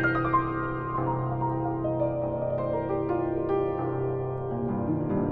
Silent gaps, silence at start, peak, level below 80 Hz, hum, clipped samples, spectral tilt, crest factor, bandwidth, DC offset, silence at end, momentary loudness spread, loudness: none; 0 s; -12 dBFS; -48 dBFS; none; under 0.1%; -11 dB/octave; 16 dB; 4.5 kHz; under 0.1%; 0 s; 4 LU; -28 LUFS